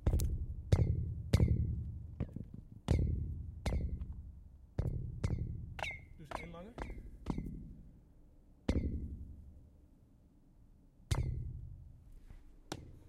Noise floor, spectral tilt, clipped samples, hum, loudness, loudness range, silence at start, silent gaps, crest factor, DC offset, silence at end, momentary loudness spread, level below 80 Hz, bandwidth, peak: -64 dBFS; -7 dB/octave; under 0.1%; none; -40 LUFS; 10 LU; 0 s; none; 24 dB; under 0.1%; 0 s; 21 LU; -42 dBFS; 15.5 kHz; -16 dBFS